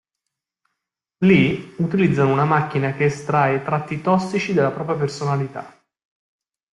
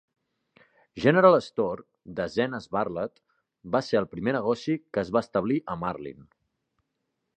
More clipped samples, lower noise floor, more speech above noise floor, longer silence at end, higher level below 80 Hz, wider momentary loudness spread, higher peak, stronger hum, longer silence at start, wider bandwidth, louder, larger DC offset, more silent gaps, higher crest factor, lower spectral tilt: neither; about the same, -82 dBFS vs -80 dBFS; first, 63 dB vs 54 dB; second, 1.05 s vs 1.25 s; about the same, -56 dBFS vs -60 dBFS; second, 7 LU vs 17 LU; about the same, -4 dBFS vs -4 dBFS; neither; first, 1.2 s vs 0.95 s; first, 11 kHz vs 9 kHz; first, -20 LUFS vs -26 LUFS; neither; neither; second, 18 dB vs 24 dB; about the same, -7.5 dB/octave vs -7 dB/octave